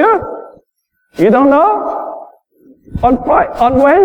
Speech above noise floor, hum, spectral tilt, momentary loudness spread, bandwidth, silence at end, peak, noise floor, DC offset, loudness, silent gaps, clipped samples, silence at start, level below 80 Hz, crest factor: 55 dB; none; -8 dB/octave; 20 LU; 10 kHz; 0 s; 0 dBFS; -65 dBFS; under 0.1%; -11 LUFS; none; under 0.1%; 0 s; -36 dBFS; 12 dB